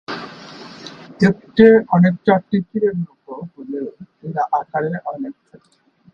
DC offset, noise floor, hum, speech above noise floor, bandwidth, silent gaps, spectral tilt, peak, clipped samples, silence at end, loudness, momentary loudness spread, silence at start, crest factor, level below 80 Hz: under 0.1%; -38 dBFS; none; 21 dB; 7.2 kHz; none; -8.5 dB/octave; 0 dBFS; under 0.1%; 0.8 s; -17 LUFS; 23 LU; 0.1 s; 18 dB; -56 dBFS